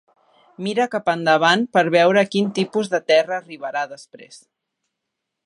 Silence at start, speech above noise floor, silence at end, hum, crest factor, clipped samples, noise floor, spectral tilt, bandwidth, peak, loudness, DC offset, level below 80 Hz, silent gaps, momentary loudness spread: 0.6 s; 61 dB; 1.1 s; none; 18 dB; under 0.1%; -80 dBFS; -5 dB/octave; 11 kHz; -2 dBFS; -19 LUFS; under 0.1%; -74 dBFS; none; 12 LU